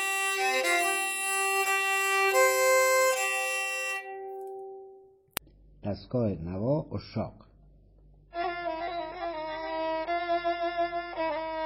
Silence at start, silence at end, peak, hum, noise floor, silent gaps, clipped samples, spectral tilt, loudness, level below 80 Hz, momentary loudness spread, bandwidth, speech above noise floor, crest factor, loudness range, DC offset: 0 s; 0 s; -2 dBFS; none; -57 dBFS; none; under 0.1%; -3 dB/octave; -28 LUFS; -58 dBFS; 17 LU; 17 kHz; 26 dB; 28 dB; 10 LU; under 0.1%